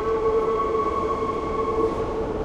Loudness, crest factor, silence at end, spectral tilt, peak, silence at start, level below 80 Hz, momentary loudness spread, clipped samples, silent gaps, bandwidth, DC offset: -24 LUFS; 12 dB; 0 s; -7 dB/octave; -12 dBFS; 0 s; -38 dBFS; 4 LU; under 0.1%; none; 9 kHz; under 0.1%